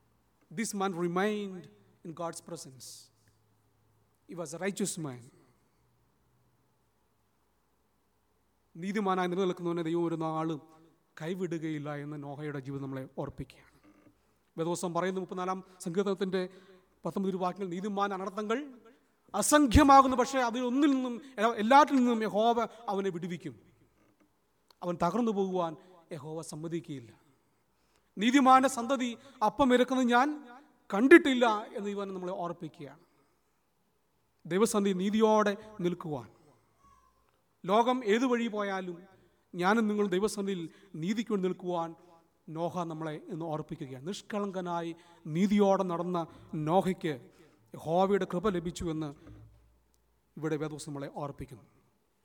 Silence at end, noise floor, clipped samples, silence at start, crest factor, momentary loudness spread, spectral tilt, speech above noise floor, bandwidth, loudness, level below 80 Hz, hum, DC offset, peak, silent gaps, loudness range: 0.65 s; -75 dBFS; under 0.1%; 0.5 s; 26 dB; 18 LU; -5 dB/octave; 45 dB; 19.5 kHz; -30 LUFS; -54 dBFS; none; under 0.1%; -6 dBFS; none; 14 LU